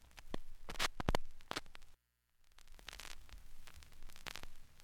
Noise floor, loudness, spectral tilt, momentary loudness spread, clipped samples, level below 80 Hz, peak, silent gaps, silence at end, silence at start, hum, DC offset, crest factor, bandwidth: -73 dBFS; -46 LUFS; -3.5 dB/octave; 20 LU; under 0.1%; -50 dBFS; -12 dBFS; none; 0 s; 0 s; 60 Hz at -75 dBFS; under 0.1%; 30 dB; 16.5 kHz